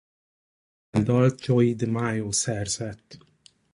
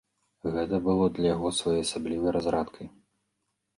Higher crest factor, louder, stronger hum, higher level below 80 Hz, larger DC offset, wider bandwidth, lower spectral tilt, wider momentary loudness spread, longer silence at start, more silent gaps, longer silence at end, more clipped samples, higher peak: about the same, 18 dB vs 16 dB; first, -24 LUFS vs -28 LUFS; neither; about the same, -54 dBFS vs -52 dBFS; neither; about the same, 11.5 kHz vs 11.5 kHz; about the same, -5.5 dB/octave vs -5.5 dB/octave; second, 9 LU vs 12 LU; first, 0.95 s vs 0.45 s; neither; second, 0.55 s vs 0.9 s; neither; first, -8 dBFS vs -14 dBFS